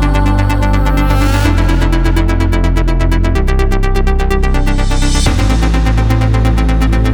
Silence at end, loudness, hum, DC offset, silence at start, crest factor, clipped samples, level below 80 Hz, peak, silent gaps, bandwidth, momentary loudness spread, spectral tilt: 0 s; -13 LUFS; none; 0.9%; 0 s; 10 dB; under 0.1%; -12 dBFS; 0 dBFS; none; 16.5 kHz; 2 LU; -6 dB/octave